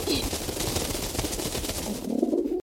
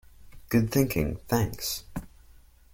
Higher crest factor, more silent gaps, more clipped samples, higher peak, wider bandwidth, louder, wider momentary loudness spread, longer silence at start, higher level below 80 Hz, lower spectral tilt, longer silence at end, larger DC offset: about the same, 18 dB vs 20 dB; neither; neither; about the same, -10 dBFS vs -8 dBFS; about the same, 16.5 kHz vs 17 kHz; about the same, -28 LUFS vs -28 LUFS; second, 4 LU vs 12 LU; second, 0 s vs 0.2 s; first, -40 dBFS vs -46 dBFS; second, -3.5 dB/octave vs -5.5 dB/octave; second, 0.15 s vs 0.65 s; neither